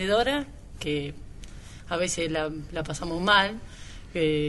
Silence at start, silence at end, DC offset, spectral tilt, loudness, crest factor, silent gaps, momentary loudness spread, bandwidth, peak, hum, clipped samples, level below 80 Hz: 0 s; 0 s; under 0.1%; -4 dB/octave; -27 LUFS; 22 dB; none; 24 LU; 11.5 kHz; -6 dBFS; none; under 0.1%; -44 dBFS